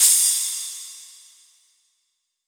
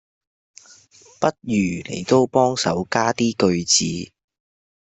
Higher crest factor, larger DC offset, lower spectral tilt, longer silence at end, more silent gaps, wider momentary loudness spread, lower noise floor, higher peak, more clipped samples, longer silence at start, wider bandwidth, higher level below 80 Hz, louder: about the same, 22 dB vs 18 dB; neither; second, 9 dB/octave vs -4 dB/octave; first, 1.45 s vs 0.9 s; neither; first, 23 LU vs 10 LU; first, -74 dBFS vs -50 dBFS; about the same, -2 dBFS vs -2 dBFS; neither; second, 0 s vs 1.2 s; first, over 20 kHz vs 8.4 kHz; second, under -90 dBFS vs -58 dBFS; about the same, -18 LUFS vs -20 LUFS